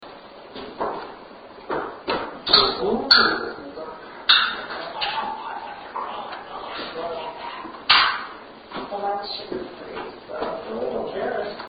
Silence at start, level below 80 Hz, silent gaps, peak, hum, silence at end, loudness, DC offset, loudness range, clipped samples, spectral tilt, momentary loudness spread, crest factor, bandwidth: 0 s; -56 dBFS; none; 0 dBFS; none; 0 s; -22 LUFS; under 0.1%; 10 LU; under 0.1%; -4.5 dB/octave; 21 LU; 24 dB; 7.8 kHz